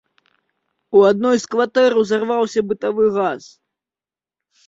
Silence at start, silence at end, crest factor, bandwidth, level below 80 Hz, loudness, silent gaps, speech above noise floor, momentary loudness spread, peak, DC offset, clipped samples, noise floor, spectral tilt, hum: 0.9 s; 1.3 s; 16 dB; 8 kHz; -64 dBFS; -17 LUFS; none; over 74 dB; 8 LU; -2 dBFS; under 0.1%; under 0.1%; under -90 dBFS; -5 dB/octave; none